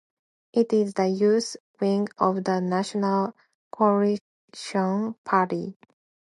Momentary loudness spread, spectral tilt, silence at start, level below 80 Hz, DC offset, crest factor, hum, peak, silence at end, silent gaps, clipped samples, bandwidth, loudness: 10 LU; -6.5 dB/octave; 0.55 s; -74 dBFS; under 0.1%; 20 dB; none; -6 dBFS; 0.6 s; 1.60-1.74 s, 3.55-3.71 s, 4.21-4.48 s, 5.18-5.24 s; under 0.1%; 11.5 kHz; -25 LUFS